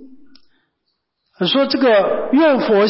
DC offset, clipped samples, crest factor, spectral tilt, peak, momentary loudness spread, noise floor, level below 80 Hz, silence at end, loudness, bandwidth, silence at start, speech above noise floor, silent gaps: under 0.1%; under 0.1%; 12 dB; -9.5 dB/octave; -6 dBFS; 4 LU; -72 dBFS; -62 dBFS; 0 s; -15 LUFS; 5.8 kHz; 0 s; 58 dB; none